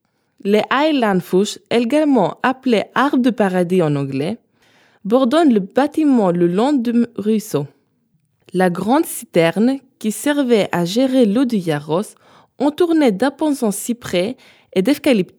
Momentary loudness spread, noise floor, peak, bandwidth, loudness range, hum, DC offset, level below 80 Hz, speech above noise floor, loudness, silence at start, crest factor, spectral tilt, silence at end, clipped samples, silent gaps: 9 LU; -63 dBFS; 0 dBFS; 19.5 kHz; 2 LU; none; under 0.1%; -66 dBFS; 47 dB; -17 LUFS; 0.45 s; 16 dB; -5.5 dB/octave; 0.15 s; under 0.1%; none